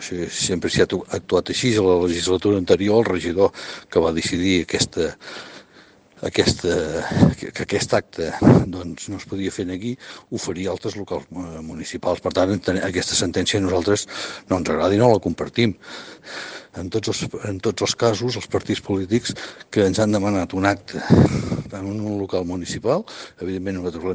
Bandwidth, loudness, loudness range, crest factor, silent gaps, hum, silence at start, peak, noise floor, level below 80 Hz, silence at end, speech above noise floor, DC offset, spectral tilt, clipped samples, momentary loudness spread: 10 kHz; -21 LUFS; 5 LU; 20 dB; none; none; 0 s; 0 dBFS; -50 dBFS; -48 dBFS; 0 s; 29 dB; under 0.1%; -5 dB/octave; under 0.1%; 14 LU